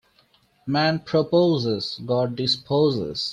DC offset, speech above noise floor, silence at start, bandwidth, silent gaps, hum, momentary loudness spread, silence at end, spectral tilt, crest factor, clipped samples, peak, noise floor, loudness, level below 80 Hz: under 0.1%; 39 dB; 0.65 s; 10 kHz; none; none; 7 LU; 0 s; -6.5 dB/octave; 16 dB; under 0.1%; -6 dBFS; -61 dBFS; -22 LUFS; -60 dBFS